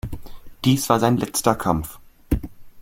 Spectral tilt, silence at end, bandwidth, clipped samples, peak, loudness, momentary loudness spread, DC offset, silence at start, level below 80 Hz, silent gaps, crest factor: -5 dB/octave; 0 s; 17 kHz; under 0.1%; -2 dBFS; -21 LUFS; 18 LU; under 0.1%; 0.05 s; -36 dBFS; none; 22 dB